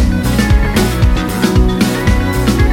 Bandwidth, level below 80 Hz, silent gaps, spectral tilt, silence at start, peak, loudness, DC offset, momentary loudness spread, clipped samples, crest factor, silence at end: 17 kHz; -16 dBFS; none; -6 dB/octave; 0 s; 0 dBFS; -13 LUFS; under 0.1%; 2 LU; under 0.1%; 12 dB; 0 s